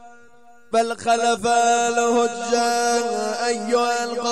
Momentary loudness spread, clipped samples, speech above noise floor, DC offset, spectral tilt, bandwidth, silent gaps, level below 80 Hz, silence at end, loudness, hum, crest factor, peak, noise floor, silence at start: 5 LU; under 0.1%; 32 dB; 0.4%; -2 dB/octave; 13 kHz; none; -62 dBFS; 0 s; -20 LUFS; none; 14 dB; -8 dBFS; -52 dBFS; 0.05 s